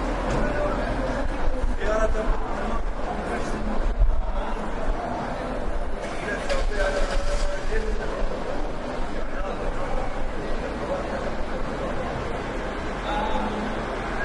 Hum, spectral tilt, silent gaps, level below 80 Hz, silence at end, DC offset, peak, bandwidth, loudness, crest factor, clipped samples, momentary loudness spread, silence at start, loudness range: none; -5.5 dB/octave; none; -28 dBFS; 0 s; under 0.1%; -8 dBFS; 11 kHz; -29 LUFS; 16 dB; under 0.1%; 6 LU; 0 s; 3 LU